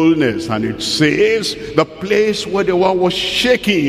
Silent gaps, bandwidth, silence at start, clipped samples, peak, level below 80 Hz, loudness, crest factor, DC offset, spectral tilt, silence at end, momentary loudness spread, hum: none; 15.5 kHz; 0 s; under 0.1%; 0 dBFS; -44 dBFS; -15 LUFS; 14 dB; under 0.1%; -4.5 dB/octave; 0 s; 5 LU; none